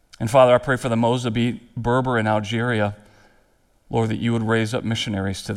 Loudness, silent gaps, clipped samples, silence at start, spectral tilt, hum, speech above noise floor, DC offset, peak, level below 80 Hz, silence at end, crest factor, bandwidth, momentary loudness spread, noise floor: -21 LUFS; none; under 0.1%; 0.2 s; -6 dB/octave; none; 40 dB; under 0.1%; -2 dBFS; -48 dBFS; 0 s; 20 dB; 13.5 kHz; 9 LU; -60 dBFS